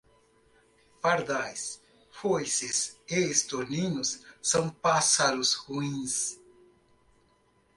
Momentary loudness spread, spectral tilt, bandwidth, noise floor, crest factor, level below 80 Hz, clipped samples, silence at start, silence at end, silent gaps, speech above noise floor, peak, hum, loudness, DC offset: 11 LU; -2.5 dB/octave; 12 kHz; -67 dBFS; 20 dB; -66 dBFS; under 0.1%; 1.05 s; 1.4 s; none; 38 dB; -10 dBFS; 60 Hz at -65 dBFS; -28 LUFS; under 0.1%